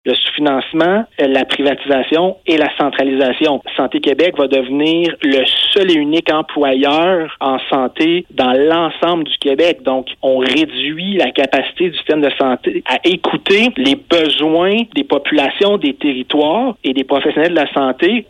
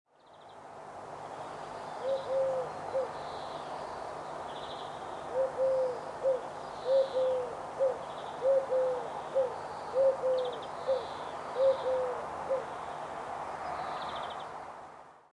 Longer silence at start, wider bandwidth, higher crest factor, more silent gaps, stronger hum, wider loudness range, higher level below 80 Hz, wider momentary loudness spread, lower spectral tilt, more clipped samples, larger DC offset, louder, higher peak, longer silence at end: second, 0.05 s vs 0.25 s; about the same, 10.5 kHz vs 11 kHz; about the same, 12 dB vs 16 dB; neither; neither; second, 2 LU vs 5 LU; first, -54 dBFS vs -70 dBFS; second, 5 LU vs 14 LU; about the same, -5 dB/octave vs -4.5 dB/octave; neither; neither; first, -14 LUFS vs -34 LUFS; first, -2 dBFS vs -18 dBFS; about the same, 0.05 s vs 0.15 s